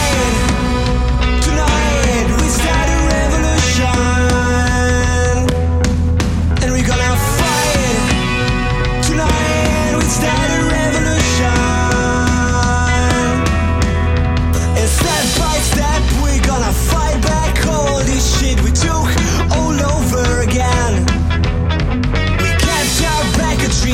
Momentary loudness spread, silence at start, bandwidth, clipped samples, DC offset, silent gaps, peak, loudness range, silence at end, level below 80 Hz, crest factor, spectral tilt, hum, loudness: 2 LU; 0 s; 16.5 kHz; under 0.1%; under 0.1%; none; -2 dBFS; 1 LU; 0 s; -18 dBFS; 10 dB; -4.5 dB/octave; none; -14 LUFS